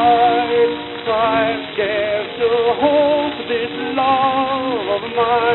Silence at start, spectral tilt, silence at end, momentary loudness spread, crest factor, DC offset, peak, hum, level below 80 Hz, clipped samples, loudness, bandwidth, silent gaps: 0 s; -8 dB/octave; 0 s; 6 LU; 14 dB; under 0.1%; -2 dBFS; none; -52 dBFS; under 0.1%; -17 LUFS; 4.2 kHz; none